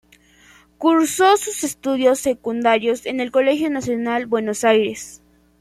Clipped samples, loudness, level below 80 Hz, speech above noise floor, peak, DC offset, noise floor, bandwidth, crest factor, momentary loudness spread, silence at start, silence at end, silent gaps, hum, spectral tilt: under 0.1%; -19 LUFS; -58 dBFS; 33 dB; -2 dBFS; under 0.1%; -51 dBFS; 15.5 kHz; 18 dB; 8 LU; 0.8 s; 0.45 s; none; none; -3 dB/octave